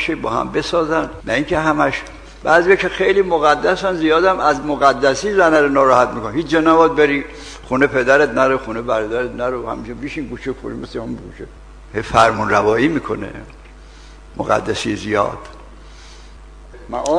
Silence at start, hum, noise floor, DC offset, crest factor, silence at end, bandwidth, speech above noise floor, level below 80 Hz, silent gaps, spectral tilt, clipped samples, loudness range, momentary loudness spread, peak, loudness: 0 s; none; -39 dBFS; under 0.1%; 16 dB; 0 s; 10.5 kHz; 23 dB; -40 dBFS; none; -5 dB/octave; under 0.1%; 9 LU; 15 LU; 0 dBFS; -16 LUFS